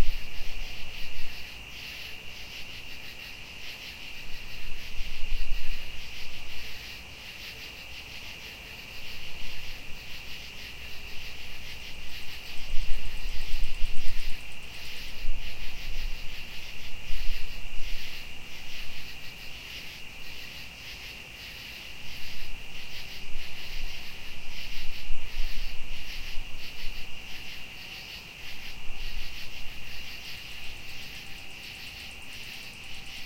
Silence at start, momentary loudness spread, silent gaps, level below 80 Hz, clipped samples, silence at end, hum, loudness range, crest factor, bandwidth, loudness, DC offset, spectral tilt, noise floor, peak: 0 s; 3 LU; none; -36 dBFS; under 0.1%; 0 s; none; 2 LU; 16 dB; 15.5 kHz; -39 LUFS; under 0.1%; -2.5 dB/octave; -42 dBFS; -6 dBFS